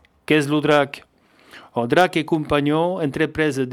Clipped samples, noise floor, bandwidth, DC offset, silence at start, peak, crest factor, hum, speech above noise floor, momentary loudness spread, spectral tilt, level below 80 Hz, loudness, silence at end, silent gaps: under 0.1%; -50 dBFS; 15.5 kHz; under 0.1%; 0.3 s; -2 dBFS; 20 dB; none; 31 dB; 9 LU; -6 dB/octave; -50 dBFS; -20 LUFS; 0 s; none